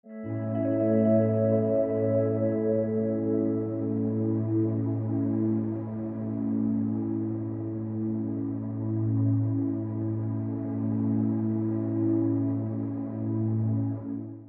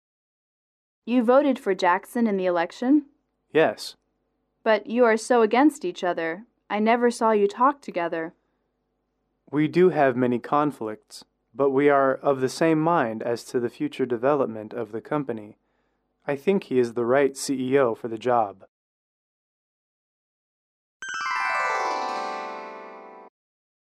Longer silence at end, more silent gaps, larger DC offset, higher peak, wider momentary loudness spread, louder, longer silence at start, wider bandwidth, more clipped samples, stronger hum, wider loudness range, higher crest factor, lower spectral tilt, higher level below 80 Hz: second, 0 s vs 0.6 s; second, none vs 18.68-21.00 s; neither; second, -12 dBFS vs -8 dBFS; second, 8 LU vs 14 LU; second, -28 LUFS vs -23 LUFS; second, 0.05 s vs 1.05 s; second, 2.6 kHz vs 14 kHz; neither; neither; second, 4 LU vs 7 LU; about the same, 14 dB vs 18 dB; first, -14.5 dB/octave vs -5.5 dB/octave; first, -62 dBFS vs -74 dBFS